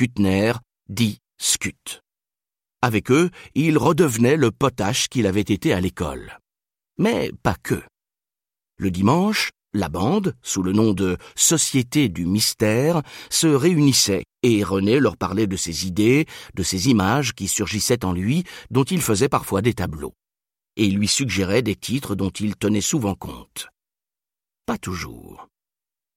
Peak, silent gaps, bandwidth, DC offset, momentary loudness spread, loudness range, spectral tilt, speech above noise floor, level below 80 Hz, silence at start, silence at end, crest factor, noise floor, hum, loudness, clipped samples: -2 dBFS; none; 16.5 kHz; under 0.1%; 12 LU; 6 LU; -4.5 dB/octave; over 70 dB; -48 dBFS; 0 s; 0.7 s; 18 dB; under -90 dBFS; none; -20 LUFS; under 0.1%